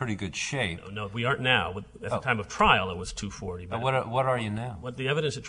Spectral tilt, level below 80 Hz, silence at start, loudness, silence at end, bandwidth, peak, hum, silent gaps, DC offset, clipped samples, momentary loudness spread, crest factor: -4.5 dB/octave; -48 dBFS; 0 s; -28 LUFS; 0 s; 10.5 kHz; -4 dBFS; none; none; under 0.1%; under 0.1%; 13 LU; 24 dB